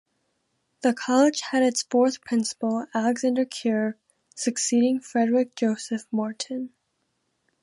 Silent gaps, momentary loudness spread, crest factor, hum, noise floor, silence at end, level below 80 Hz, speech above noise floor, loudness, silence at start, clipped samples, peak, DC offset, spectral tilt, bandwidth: none; 8 LU; 18 dB; none; -75 dBFS; 0.95 s; -78 dBFS; 51 dB; -24 LUFS; 0.85 s; under 0.1%; -8 dBFS; under 0.1%; -3.5 dB/octave; 11.5 kHz